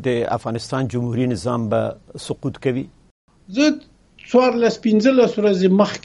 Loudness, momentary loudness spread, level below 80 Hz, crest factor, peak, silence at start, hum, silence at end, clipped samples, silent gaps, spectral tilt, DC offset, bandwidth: -19 LUFS; 12 LU; -54 dBFS; 16 dB; -2 dBFS; 0 s; none; 0.05 s; under 0.1%; 3.11-3.28 s; -6.5 dB/octave; under 0.1%; 11.5 kHz